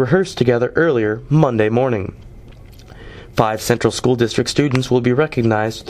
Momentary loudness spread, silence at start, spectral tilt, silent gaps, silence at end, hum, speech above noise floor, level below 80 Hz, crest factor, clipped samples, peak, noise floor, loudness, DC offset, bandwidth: 4 LU; 0 s; -6 dB/octave; none; 0 s; none; 23 dB; -42 dBFS; 16 dB; under 0.1%; 0 dBFS; -39 dBFS; -17 LUFS; under 0.1%; 15 kHz